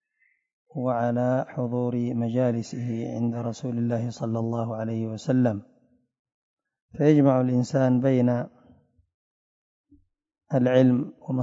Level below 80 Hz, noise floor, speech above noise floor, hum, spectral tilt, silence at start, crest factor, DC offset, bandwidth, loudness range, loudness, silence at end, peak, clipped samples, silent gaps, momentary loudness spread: -68 dBFS; -69 dBFS; 46 dB; none; -8.5 dB/octave; 0.75 s; 20 dB; under 0.1%; 7.8 kHz; 4 LU; -25 LUFS; 0 s; -6 dBFS; under 0.1%; 6.19-6.25 s, 6.34-6.57 s, 6.82-6.89 s, 9.14-9.84 s; 11 LU